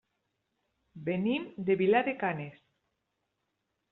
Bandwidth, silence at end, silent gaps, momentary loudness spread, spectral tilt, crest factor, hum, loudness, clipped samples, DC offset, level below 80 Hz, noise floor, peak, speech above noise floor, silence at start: 4.1 kHz; 1.4 s; none; 14 LU; -5 dB/octave; 20 dB; none; -30 LUFS; under 0.1%; under 0.1%; -74 dBFS; -82 dBFS; -14 dBFS; 52 dB; 0.95 s